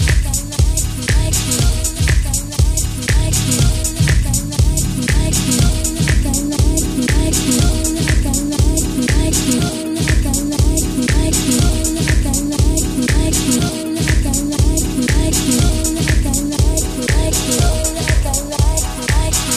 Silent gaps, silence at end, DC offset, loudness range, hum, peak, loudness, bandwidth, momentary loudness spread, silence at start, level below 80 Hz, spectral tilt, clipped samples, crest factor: none; 0 s; under 0.1%; 1 LU; none; -2 dBFS; -16 LUFS; 15.5 kHz; 3 LU; 0 s; -18 dBFS; -4 dB/octave; under 0.1%; 12 dB